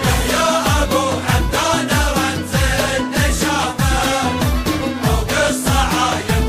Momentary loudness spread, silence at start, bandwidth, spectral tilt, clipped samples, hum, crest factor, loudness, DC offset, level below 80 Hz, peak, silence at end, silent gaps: 3 LU; 0 s; 15.5 kHz; -4 dB/octave; under 0.1%; none; 14 dB; -17 LUFS; under 0.1%; -24 dBFS; -2 dBFS; 0 s; none